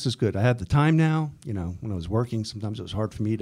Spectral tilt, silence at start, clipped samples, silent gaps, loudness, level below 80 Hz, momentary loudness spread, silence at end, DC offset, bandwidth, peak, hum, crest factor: -7 dB/octave; 0 s; under 0.1%; none; -26 LUFS; -46 dBFS; 11 LU; 0 s; under 0.1%; 11 kHz; -8 dBFS; none; 16 dB